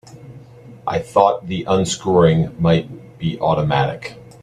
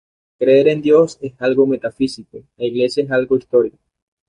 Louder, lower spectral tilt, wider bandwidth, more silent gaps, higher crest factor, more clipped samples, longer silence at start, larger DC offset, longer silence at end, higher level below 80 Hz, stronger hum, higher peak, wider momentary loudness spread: about the same, -18 LUFS vs -16 LUFS; about the same, -6 dB/octave vs -6.5 dB/octave; about the same, 11 kHz vs 11 kHz; neither; about the same, 18 dB vs 14 dB; neither; second, 0.1 s vs 0.4 s; neither; second, 0.2 s vs 0.6 s; first, -46 dBFS vs -58 dBFS; neither; about the same, 0 dBFS vs -2 dBFS; first, 13 LU vs 10 LU